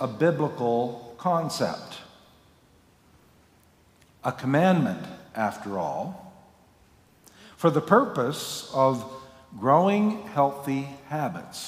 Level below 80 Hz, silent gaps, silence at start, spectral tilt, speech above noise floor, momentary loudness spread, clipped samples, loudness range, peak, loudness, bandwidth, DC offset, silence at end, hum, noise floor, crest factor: -66 dBFS; none; 0 s; -6 dB/octave; 34 dB; 16 LU; under 0.1%; 8 LU; -6 dBFS; -26 LUFS; 16 kHz; under 0.1%; 0 s; none; -59 dBFS; 20 dB